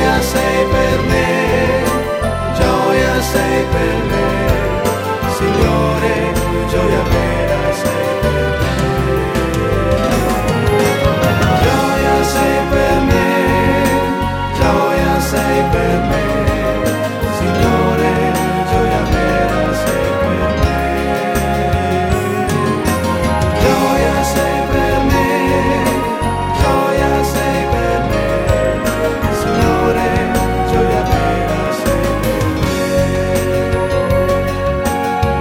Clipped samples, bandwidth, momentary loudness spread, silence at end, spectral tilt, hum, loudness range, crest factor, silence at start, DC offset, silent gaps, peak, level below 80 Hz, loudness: under 0.1%; 16.5 kHz; 3 LU; 0 s; -5.5 dB/octave; none; 2 LU; 14 dB; 0 s; under 0.1%; none; 0 dBFS; -24 dBFS; -15 LUFS